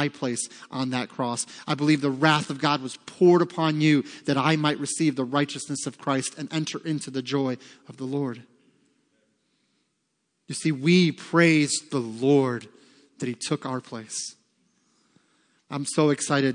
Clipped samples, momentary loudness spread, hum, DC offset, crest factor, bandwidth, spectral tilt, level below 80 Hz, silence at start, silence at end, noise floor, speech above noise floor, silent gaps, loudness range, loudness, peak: under 0.1%; 13 LU; none; under 0.1%; 22 dB; 10.5 kHz; -5 dB/octave; -76 dBFS; 0 s; 0 s; -75 dBFS; 51 dB; none; 10 LU; -25 LUFS; -4 dBFS